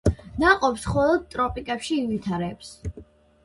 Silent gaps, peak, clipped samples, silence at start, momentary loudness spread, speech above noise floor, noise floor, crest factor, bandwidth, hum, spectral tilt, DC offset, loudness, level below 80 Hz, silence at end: none; -2 dBFS; under 0.1%; 0.05 s; 17 LU; 25 dB; -48 dBFS; 22 dB; 11.5 kHz; none; -5.5 dB/octave; under 0.1%; -24 LUFS; -38 dBFS; 0.4 s